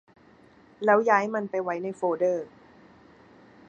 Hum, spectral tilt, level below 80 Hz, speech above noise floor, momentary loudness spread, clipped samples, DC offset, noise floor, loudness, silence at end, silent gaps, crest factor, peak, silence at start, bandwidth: none; -6.5 dB/octave; -74 dBFS; 31 dB; 11 LU; under 0.1%; under 0.1%; -56 dBFS; -25 LUFS; 1.2 s; none; 22 dB; -6 dBFS; 0.8 s; 8.8 kHz